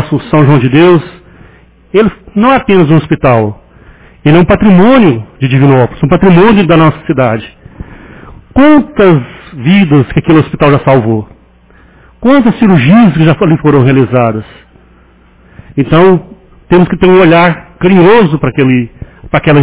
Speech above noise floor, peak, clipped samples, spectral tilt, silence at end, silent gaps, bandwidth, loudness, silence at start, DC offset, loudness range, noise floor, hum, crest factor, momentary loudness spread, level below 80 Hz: 36 dB; 0 dBFS; 3%; -11.5 dB/octave; 0 s; none; 4 kHz; -7 LUFS; 0 s; under 0.1%; 3 LU; -41 dBFS; none; 8 dB; 9 LU; -32 dBFS